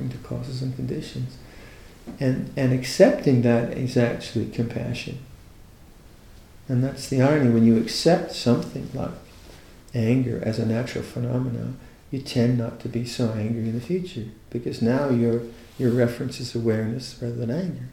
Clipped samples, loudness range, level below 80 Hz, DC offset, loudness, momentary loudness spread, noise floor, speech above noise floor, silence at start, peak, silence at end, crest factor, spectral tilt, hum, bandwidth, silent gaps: under 0.1%; 5 LU; -50 dBFS; under 0.1%; -24 LUFS; 15 LU; -48 dBFS; 24 dB; 0 s; -2 dBFS; 0 s; 22 dB; -7 dB/octave; none; 15.5 kHz; none